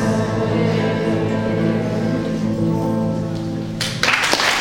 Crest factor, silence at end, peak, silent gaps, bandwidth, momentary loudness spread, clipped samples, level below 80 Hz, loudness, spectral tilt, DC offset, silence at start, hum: 18 dB; 0 s; 0 dBFS; none; 16.5 kHz; 7 LU; under 0.1%; -42 dBFS; -19 LUFS; -5 dB/octave; under 0.1%; 0 s; none